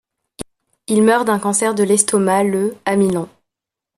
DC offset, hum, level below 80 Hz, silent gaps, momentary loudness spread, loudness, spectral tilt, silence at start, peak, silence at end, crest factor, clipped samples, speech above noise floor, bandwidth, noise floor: under 0.1%; none; -56 dBFS; none; 21 LU; -16 LUFS; -4.5 dB/octave; 0.4 s; 0 dBFS; 0.7 s; 18 dB; under 0.1%; 69 dB; 13.5 kHz; -84 dBFS